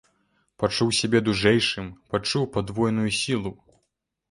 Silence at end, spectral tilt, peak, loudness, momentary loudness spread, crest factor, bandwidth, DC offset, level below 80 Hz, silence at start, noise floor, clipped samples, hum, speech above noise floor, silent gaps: 0.8 s; -4.5 dB/octave; -6 dBFS; -24 LUFS; 8 LU; 20 dB; 11.5 kHz; under 0.1%; -52 dBFS; 0.6 s; -77 dBFS; under 0.1%; none; 53 dB; none